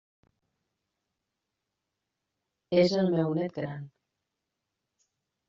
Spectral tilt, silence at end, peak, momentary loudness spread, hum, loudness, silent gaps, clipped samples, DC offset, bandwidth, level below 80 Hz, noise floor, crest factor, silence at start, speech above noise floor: -6 dB/octave; 1.6 s; -10 dBFS; 13 LU; none; -28 LUFS; none; under 0.1%; under 0.1%; 7.4 kHz; -72 dBFS; -85 dBFS; 22 dB; 2.7 s; 58 dB